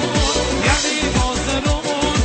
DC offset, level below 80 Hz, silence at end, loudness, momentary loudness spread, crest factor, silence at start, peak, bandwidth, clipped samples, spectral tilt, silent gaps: under 0.1%; -26 dBFS; 0 s; -18 LUFS; 3 LU; 14 dB; 0 s; -4 dBFS; 8.8 kHz; under 0.1%; -3.5 dB/octave; none